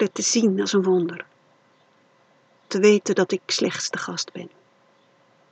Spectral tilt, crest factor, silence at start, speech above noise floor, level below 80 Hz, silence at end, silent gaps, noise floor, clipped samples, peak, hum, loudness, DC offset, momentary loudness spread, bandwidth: -3.5 dB/octave; 20 dB; 0 s; 38 dB; -84 dBFS; 1.05 s; none; -60 dBFS; under 0.1%; -4 dBFS; none; -22 LUFS; under 0.1%; 18 LU; 9 kHz